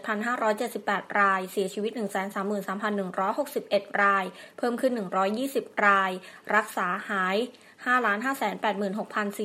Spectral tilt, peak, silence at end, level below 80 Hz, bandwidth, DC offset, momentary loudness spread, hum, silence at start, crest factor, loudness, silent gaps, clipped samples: -4.5 dB/octave; -6 dBFS; 0 s; -82 dBFS; 16 kHz; under 0.1%; 7 LU; none; 0 s; 20 dB; -27 LUFS; none; under 0.1%